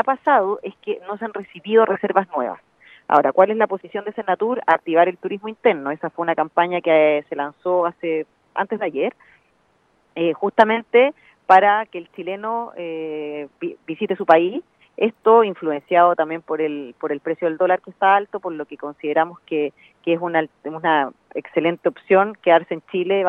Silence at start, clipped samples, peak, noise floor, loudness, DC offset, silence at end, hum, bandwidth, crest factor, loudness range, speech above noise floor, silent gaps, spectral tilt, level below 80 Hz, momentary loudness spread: 0 s; under 0.1%; 0 dBFS; -62 dBFS; -20 LUFS; under 0.1%; 0 s; none; 5.6 kHz; 20 dB; 4 LU; 42 dB; none; -7.5 dB/octave; -74 dBFS; 14 LU